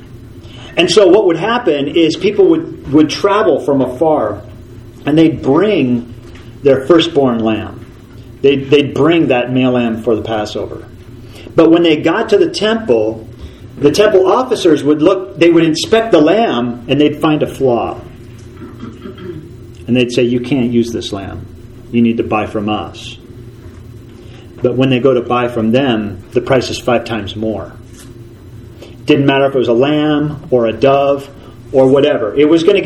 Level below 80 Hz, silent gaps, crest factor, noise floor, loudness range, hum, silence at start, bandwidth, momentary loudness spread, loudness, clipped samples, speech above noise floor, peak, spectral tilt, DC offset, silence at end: -42 dBFS; none; 12 dB; -34 dBFS; 6 LU; none; 0 s; 12.5 kHz; 19 LU; -12 LUFS; 0.2%; 22 dB; 0 dBFS; -6 dB/octave; under 0.1%; 0 s